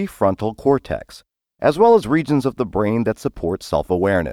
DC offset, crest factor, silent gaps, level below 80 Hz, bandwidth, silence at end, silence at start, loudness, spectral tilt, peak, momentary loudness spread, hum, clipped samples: under 0.1%; 16 dB; none; -42 dBFS; 15 kHz; 0 s; 0 s; -19 LUFS; -7 dB/octave; -4 dBFS; 10 LU; none; under 0.1%